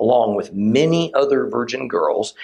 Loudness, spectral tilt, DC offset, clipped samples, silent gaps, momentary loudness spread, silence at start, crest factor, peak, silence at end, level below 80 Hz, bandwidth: -18 LUFS; -6 dB/octave; under 0.1%; under 0.1%; none; 6 LU; 0 s; 14 dB; -4 dBFS; 0 s; -60 dBFS; 10 kHz